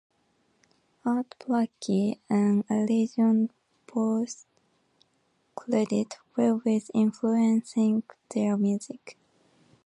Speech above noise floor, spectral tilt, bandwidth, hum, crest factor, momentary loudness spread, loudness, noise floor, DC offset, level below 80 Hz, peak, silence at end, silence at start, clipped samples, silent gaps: 45 dB; -7 dB/octave; 10.5 kHz; none; 16 dB; 11 LU; -27 LUFS; -71 dBFS; under 0.1%; -76 dBFS; -12 dBFS; 0.75 s; 1.05 s; under 0.1%; none